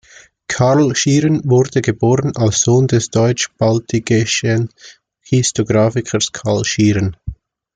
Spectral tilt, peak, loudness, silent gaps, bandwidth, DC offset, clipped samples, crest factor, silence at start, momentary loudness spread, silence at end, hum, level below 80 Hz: -5 dB/octave; -2 dBFS; -15 LUFS; none; 9.4 kHz; under 0.1%; under 0.1%; 14 dB; 0.5 s; 6 LU; 0.4 s; none; -44 dBFS